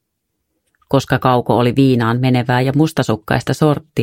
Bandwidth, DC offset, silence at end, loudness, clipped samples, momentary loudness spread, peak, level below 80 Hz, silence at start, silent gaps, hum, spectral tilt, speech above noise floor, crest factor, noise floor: 16 kHz; under 0.1%; 0 s; -15 LUFS; under 0.1%; 5 LU; 0 dBFS; -46 dBFS; 0.9 s; none; none; -7 dB/octave; 58 dB; 16 dB; -73 dBFS